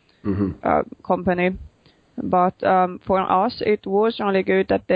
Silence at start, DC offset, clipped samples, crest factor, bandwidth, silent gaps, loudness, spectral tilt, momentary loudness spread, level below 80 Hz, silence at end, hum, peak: 0.25 s; under 0.1%; under 0.1%; 16 dB; 5.2 kHz; none; -21 LUFS; -9.5 dB/octave; 6 LU; -46 dBFS; 0 s; none; -4 dBFS